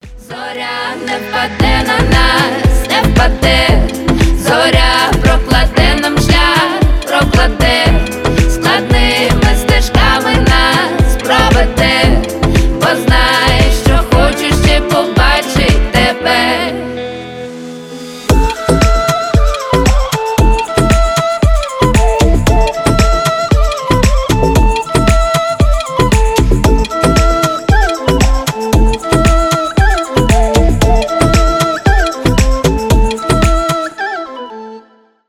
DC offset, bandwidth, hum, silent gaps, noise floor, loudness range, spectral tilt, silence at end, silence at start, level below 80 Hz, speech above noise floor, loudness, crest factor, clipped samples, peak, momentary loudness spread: under 0.1%; 15.5 kHz; none; none; -44 dBFS; 3 LU; -5 dB/octave; 0.5 s; 0.05 s; -14 dBFS; 34 dB; -11 LUFS; 10 dB; under 0.1%; 0 dBFS; 7 LU